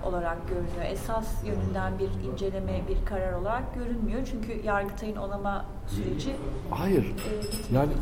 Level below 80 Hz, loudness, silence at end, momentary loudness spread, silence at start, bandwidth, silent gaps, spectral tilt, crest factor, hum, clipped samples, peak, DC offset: -34 dBFS; -31 LUFS; 0 s; 7 LU; 0 s; 16.5 kHz; none; -6.5 dB/octave; 16 dB; none; under 0.1%; -12 dBFS; 0.4%